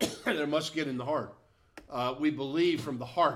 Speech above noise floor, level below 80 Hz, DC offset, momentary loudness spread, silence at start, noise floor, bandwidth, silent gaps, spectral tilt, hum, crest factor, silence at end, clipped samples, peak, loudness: 24 dB; -66 dBFS; under 0.1%; 6 LU; 0 s; -55 dBFS; 15.5 kHz; none; -5 dB/octave; none; 18 dB; 0 s; under 0.1%; -14 dBFS; -31 LUFS